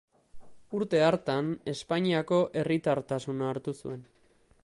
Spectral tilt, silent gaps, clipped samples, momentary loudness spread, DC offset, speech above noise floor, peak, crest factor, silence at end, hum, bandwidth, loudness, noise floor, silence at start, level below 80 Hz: -6.5 dB/octave; none; under 0.1%; 12 LU; under 0.1%; 35 dB; -12 dBFS; 18 dB; 0.6 s; none; 11.5 kHz; -29 LUFS; -64 dBFS; 0.35 s; -66 dBFS